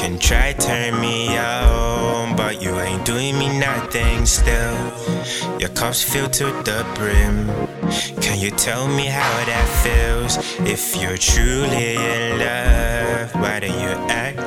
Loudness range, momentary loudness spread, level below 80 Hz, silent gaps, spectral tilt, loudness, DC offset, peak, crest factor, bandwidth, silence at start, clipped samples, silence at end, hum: 1 LU; 6 LU; -22 dBFS; none; -3.5 dB/octave; -19 LUFS; under 0.1%; 0 dBFS; 18 dB; 17 kHz; 0 s; under 0.1%; 0 s; none